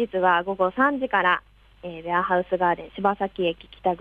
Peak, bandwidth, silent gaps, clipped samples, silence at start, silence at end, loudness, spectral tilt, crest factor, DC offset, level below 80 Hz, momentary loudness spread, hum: -8 dBFS; 4.8 kHz; none; under 0.1%; 0 s; 0.05 s; -23 LUFS; -7.5 dB/octave; 16 dB; under 0.1%; -56 dBFS; 7 LU; none